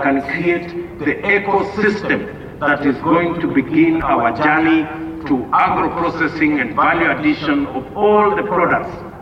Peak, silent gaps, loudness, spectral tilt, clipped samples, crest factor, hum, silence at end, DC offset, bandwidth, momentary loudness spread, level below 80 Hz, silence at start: -4 dBFS; none; -16 LUFS; -7.5 dB/octave; under 0.1%; 14 dB; none; 0 s; under 0.1%; 7.4 kHz; 7 LU; -42 dBFS; 0 s